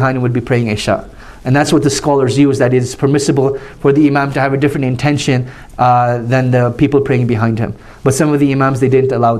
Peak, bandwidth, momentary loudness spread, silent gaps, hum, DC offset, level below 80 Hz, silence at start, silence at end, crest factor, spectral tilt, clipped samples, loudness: -2 dBFS; 14 kHz; 5 LU; none; none; under 0.1%; -40 dBFS; 0 s; 0 s; 12 dB; -6.5 dB/octave; under 0.1%; -13 LUFS